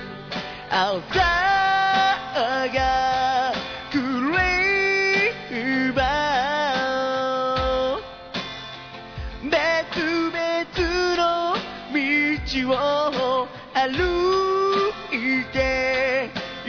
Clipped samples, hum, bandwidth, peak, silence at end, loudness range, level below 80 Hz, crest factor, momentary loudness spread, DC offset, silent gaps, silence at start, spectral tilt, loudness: under 0.1%; none; 5.4 kHz; -10 dBFS; 0 s; 4 LU; -42 dBFS; 14 dB; 11 LU; under 0.1%; none; 0 s; -4.5 dB/octave; -22 LUFS